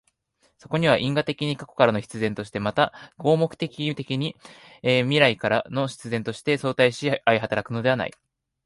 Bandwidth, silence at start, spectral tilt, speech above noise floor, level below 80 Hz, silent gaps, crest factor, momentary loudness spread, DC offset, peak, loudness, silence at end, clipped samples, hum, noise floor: 11.5 kHz; 0.7 s; -6 dB/octave; 44 dB; -60 dBFS; none; 22 dB; 8 LU; under 0.1%; -2 dBFS; -24 LUFS; 0.55 s; under 0.1%; none; -67 dBFS